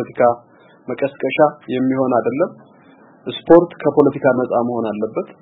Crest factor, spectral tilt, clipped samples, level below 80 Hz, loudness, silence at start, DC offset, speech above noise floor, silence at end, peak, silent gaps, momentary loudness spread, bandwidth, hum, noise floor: 18 dB; -9.5 dB/octave; under 0.1%; -56 dBFS; -17 LUFS; 0 s; under 0.1%; 31 dB; 0.1 s; 0 dBFS; none; 16 LU; 4 kHz; none; -47 dBFS